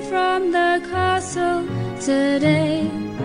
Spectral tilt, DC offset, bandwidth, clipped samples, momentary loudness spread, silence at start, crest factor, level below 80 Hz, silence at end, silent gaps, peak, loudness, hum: -5.5 dB/octave; under 0.1%; 11 kHz; under 0.1%; 6 LU; 0 s; 14 dB; -50 dBFS; 0 s; none; -6 dBFS; -20 LUFS; none